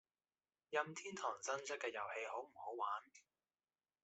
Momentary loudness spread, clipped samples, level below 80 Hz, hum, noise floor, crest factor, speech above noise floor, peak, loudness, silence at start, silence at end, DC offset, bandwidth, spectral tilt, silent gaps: 6 LU; under 0.1%; under -90 dBFS; none; under -90 dBFS; 24 dB; over 44 dB; -24 dBFS; -45 LUFS; 0.7 s; 0.85 s; under 0.1%; 8.2 kHz; -2 dB/octave; none